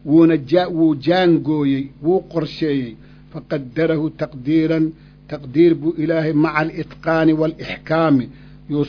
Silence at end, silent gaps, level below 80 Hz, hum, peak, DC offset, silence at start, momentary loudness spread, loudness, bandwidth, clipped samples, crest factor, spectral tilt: 0 s; none; -48 dBFS; none; -2 dBFS; under 0.1%; 0.05 s; 11 LU; -18 LUFS; 5.4 kHz; under 0.1%; 16 dB; -9 dB/octave